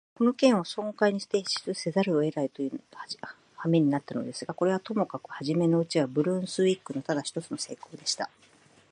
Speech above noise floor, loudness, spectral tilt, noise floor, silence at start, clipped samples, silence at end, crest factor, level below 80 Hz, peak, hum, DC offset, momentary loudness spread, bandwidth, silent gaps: 31 dB; -28 LUFS; -5.5 dB/octave; -59 dBFS; 0.2 s; under 0.1%; 0.65 s; 20 dB; -76 dBFS; -8 dBFS; none; under 0.1%; 11 LU; 10.5 kHz; none